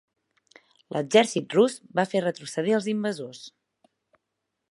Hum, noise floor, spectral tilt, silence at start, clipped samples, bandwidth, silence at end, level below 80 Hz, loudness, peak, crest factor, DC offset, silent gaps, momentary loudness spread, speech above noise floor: none; -82 dBFS; -4.5 dB/octave; 0.9 s; under 0.1%; 11.5 kHz; 1.2 s; -78 dBFS; -25 LUFS; -4 dBFS; 22 dB; under 0.1%; none; 16 LU; 57 dB